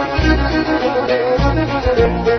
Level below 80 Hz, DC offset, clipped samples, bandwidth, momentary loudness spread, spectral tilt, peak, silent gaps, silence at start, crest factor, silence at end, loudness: -22 dBFS; under 0.1%; under 0.1%; 6.4 kHz; 2 LU; -7 dB/octave; -2 dBFS; none; 0 s; 14 dB; 0 s; -16 LUFS